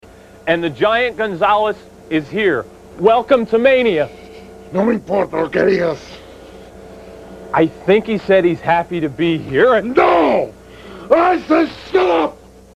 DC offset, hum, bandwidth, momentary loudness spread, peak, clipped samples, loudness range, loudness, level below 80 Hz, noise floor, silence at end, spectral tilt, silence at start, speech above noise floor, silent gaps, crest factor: under 0.1%; none; 12 kHz; 12 LU; 0 dBFS; under 0.1%; 4 LU; -16 LUFS; -48 dBFS; -37 dBFS; 0.4 s; -6.5 dB/octave; 0.45 s; 23 dB; none; 16 dB